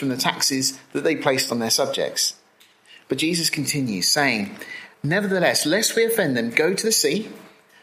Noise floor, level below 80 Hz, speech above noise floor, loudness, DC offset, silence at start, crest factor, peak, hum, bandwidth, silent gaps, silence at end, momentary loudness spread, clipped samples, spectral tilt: -55 dBFS; -68 dBFS; 34 dB; -21 LUFS; under 0.1%; 0 s; 20 dB; -2 dBFS; none; 16 kHz; none; 0.35 s; 8 LU; under 0.1%; -2.5 dB/octave